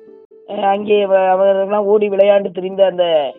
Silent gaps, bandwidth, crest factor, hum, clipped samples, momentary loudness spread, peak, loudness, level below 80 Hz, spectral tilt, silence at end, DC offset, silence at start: none; 3.8 kHz; 14 dB; none; under 0.1%; 6 LU; 0 dBFS; -14 LUFS; -68 dBFS; -9 dB/octave; 0.05 s; under 0.1%; 0.5 s